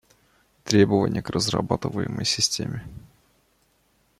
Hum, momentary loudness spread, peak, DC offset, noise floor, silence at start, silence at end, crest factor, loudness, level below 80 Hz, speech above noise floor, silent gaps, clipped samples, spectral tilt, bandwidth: none; 15 LU; -2 dBFS; under 0.1%; -65 dBFS; 0.65 s; 1.2 s; 24 dB; -23 LUFS; -52 dBFS; 42 dB; none; under 0.1%; -4.5 dB/octave; 15 kHz